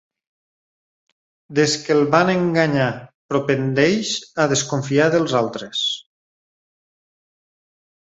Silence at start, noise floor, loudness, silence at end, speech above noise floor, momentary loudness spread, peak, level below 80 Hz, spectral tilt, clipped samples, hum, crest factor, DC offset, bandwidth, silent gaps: 1.5 s; under -90 dBFS; -19 LUFS; 2.2 s; over 72 dB; 8 LU; -2 dBFS; -60 dBFS; -4.5 dB/octave; under 0.1%; none; 20 dB; under 0.1%; 8.2 kHz; 3.15-3.29 s